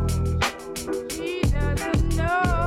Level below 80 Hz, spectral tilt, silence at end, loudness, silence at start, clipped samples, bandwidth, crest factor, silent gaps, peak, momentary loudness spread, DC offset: -28 dBFS; -5.5 dB/octave; 0 s; -25 LUFS; 0 s; under 0.1%; 15.5 kHz; 10 dB; none; -12 dBFS; 7 LU; under 0.1%